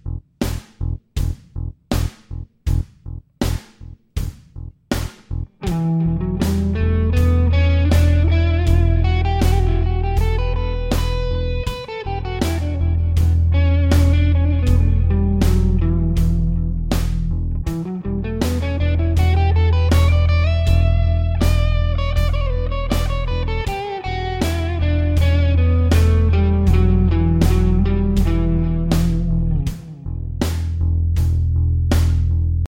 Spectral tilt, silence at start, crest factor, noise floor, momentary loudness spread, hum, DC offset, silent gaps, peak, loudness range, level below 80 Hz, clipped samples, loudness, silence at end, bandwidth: -7 dB/octave; 0.05 s; 14 dB; -39 dBFS; 11 LU; none; 0.7%; none; -4 dBFS; 9 LU; -20 dBFS; under 0.1%; -19 LUFS; 0.1 s; 16 kHz